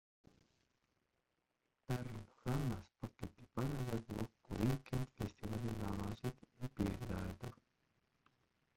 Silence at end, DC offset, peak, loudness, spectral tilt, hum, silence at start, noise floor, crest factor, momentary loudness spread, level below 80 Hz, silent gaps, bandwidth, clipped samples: 1.2 s; under 0.1%; -24 dBFS; -44 LUFS; -7 dB/octave; none; 1.9 s; -86 dBFS; 22 dB; 10 LU; -58 dBFS; none; 16.5 kHz; under 0.1%